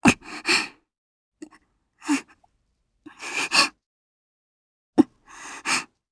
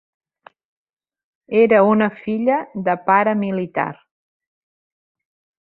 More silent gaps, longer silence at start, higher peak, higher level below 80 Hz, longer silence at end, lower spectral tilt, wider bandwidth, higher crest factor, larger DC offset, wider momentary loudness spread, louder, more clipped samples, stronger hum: first, 0.98-1.32 s, 3.86-4.93 s vs none; second, 0.05 s vs 1.5 s; about the same, 0 dBFS vs -2 dBFS; first, -56 dBFS vs -64 dBFS; second, 0.25 s vs 1.65 s; second, -2.5 dB/octave vs -11 dB/octave; first, 11 kHz vs 4.1 kHz; first, 26 dB vs 18 dB; neither; first, 18 LU vs 10 LU; second, -23 LUFS vs -18 LUFS; neither; neither